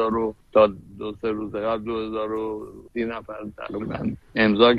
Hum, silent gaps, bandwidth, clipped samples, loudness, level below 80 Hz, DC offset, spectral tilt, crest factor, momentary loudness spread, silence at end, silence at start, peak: none; none; 5.4 kHz; under 0.1%; -25 LUFS; -50 dBFS; under 0.1%; -7.5 dB/octave; 22 dB; 15 LU; 0 s; 0 s; -2 dBFS